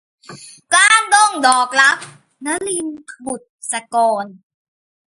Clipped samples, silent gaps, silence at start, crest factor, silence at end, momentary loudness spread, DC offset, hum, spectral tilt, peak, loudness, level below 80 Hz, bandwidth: under 0.1%; 3.49-3.58 s; 0.3 s; 18 dB; 0.75 s; 18 LU; under 0.1%; none; 0 dB/octave; 0 dBFS; -14 LUFS; -66 dBFS; 11.5 kHz